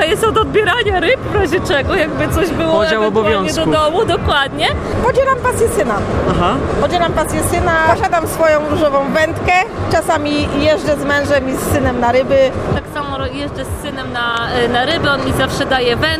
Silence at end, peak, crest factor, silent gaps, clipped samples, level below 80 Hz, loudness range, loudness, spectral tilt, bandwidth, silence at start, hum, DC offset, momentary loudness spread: 0 s; 0 dBFS; 14 dB; none; under 0.1%; -30 dBFS; 2 LU; -14 LUFS; -5 dB/octave; 15.5 kHz; 0 s; none; under 0.1%; 4 LU